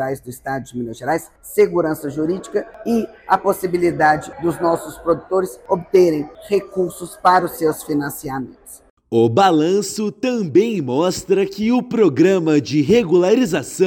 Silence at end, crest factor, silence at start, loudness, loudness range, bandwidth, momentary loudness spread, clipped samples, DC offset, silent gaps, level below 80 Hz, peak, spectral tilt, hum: 0 s; 16 dB; 0 s; -18 LUFS; 4 LU; 17 kHz; 11 LU; under 0.1%; under 0.1%; 8.90-8.97 s; -52 dBFS; -2 dBFS; -5.5 dB/octave; none